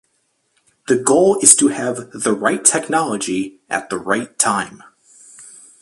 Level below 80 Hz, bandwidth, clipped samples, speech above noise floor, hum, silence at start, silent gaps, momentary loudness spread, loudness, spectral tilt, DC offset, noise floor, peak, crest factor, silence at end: -60 dBFS; 16 kHz; under 0.1%; 49 dB; none; 0.9 s; none; 14 LU; -16 LUFS; -2.5 dB/octave; under 0.1%; -66 dBFS; 0 dBFS; 18 dB; 0.35 s